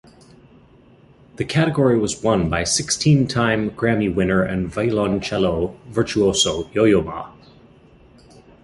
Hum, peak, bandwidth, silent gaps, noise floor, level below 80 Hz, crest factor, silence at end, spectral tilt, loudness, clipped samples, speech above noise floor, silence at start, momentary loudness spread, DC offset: none; -4 dBFS; 11.5 kHz; none; -50 dBFS; -42 dBFS; 16 dB; 1.35 s; -5 dB/octave; -19 LUFS; under 0.1%; 31 dB; 1.4 s; 7 LU; under 0.1%